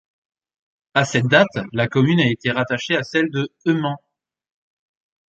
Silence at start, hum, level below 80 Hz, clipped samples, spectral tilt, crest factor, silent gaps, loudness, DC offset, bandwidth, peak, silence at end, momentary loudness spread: 0.95 s; none; -58 dBFS; under 0.1%; -6 dB/octave; 20 dB; none; -19 LUFS; under 0.1%; 8.4 kHz; 0 dBFS; 1.35 s; 7 LU